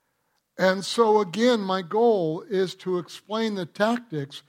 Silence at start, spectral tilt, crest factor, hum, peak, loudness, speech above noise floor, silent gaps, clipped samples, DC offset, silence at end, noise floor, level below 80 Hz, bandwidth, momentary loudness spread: 0.6 s; -5 dB/octave; 18 dB; none; -6 dBFS; -24 LUFS; 49 dB; none; under 0.1%; under 0.1%; 0.1 s; -73 dBFS; -74 dBFS; 15.5 kHz; 9 LU